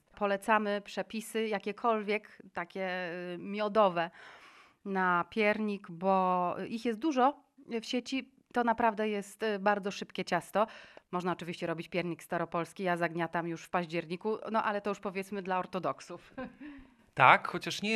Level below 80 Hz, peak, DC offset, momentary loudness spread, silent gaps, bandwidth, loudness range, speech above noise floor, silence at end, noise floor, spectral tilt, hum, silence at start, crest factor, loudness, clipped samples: -72 dBFS; -6 dBFS; under 0.1%; 12 LU; none; 13 kHz; 4 LU; 20 dB; 0 s; -52 dBFS; -5 dB/octave; none; 0.15 s; 26 dB; -32 LUFS; under 0.1%